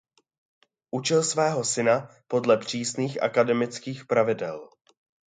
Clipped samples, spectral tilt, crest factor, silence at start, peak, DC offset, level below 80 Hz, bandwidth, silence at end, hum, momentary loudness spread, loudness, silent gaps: under 0.1%; -4 dB/octave; 20 dB; 0.95 s; -6 dBFS; under 0.1%; -72 dBFS; 9.6 kHz; 0.6 s; none; 8 LU; -25 LUFS; none